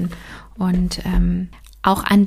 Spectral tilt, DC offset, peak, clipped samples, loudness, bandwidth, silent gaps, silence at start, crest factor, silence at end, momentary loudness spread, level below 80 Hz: -6.5 dB/octave; under 0.1%; -2 dBFS; under 0.1%; -20 LUFS; 15.5 kHz; none; 0 s; 16 dB; 0 s; 15 LU; -28 dBFS